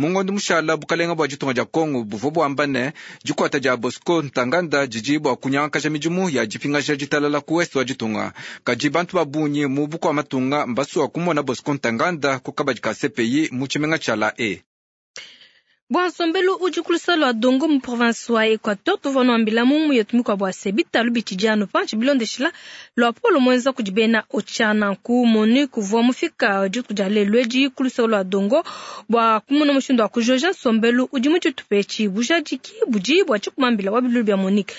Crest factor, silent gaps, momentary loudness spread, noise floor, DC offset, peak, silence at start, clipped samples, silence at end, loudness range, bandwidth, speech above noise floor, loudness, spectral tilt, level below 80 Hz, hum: 16 dB; 14.66-15.14 s, 15.82-15.87 s; 6 LU; -52 dBFS; under 0.1%; -4 dBFS; 0 s; under 0.1%; 0 s; 3 LU; 8 kHz; 33 dB; -20 LUFS; -5 dB/octave; -68 dBFS; none